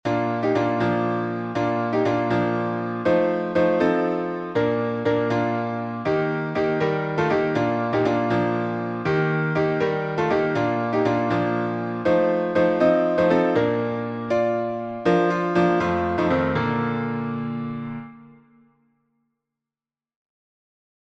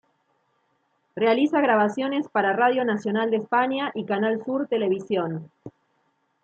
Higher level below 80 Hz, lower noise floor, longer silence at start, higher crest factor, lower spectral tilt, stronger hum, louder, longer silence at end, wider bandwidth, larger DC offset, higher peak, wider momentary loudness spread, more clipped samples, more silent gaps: first, -56 dBFS vs -74 dBFS; first, under -90 dBFS vs -70 dBFS; second, 0.05 s vs 1.15 s; about the same, 16 dB vs 16 dB; first, -8 dB/octave vs -6.5 dB/octave; neither; about the same, -22 LUFS vs -23 LUFS; first, 2.75 s vs 0.75 s; about the same, 8 kHz vs 8 kHz; neither; about the same, -6 dBFS vs -8 dBFS; about the same, 7 LU vs 7 LU; neither; neither